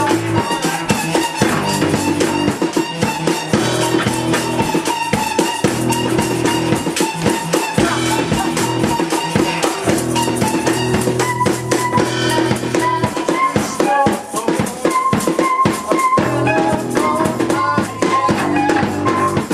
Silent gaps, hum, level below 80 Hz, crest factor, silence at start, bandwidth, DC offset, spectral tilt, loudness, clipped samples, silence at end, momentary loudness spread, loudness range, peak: none; none; -44 dBFS; 16 dB; 0 s; 15.5 kHz; under 0.1%; -4.5 dB/octave; -16 LUFS; under 0.1%; 0 s; 2 LU; 1 LU; 0 dBFS